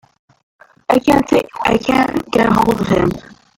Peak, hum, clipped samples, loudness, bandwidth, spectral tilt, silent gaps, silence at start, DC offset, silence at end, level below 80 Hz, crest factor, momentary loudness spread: -2 dBFS; none; under 0.1%; -15 LUFS; 17 kHz; -6 dB/octave; none; 0.9 s; under 0.1%; 0.35 s; -40 dBFS; 14 dB; 5 LU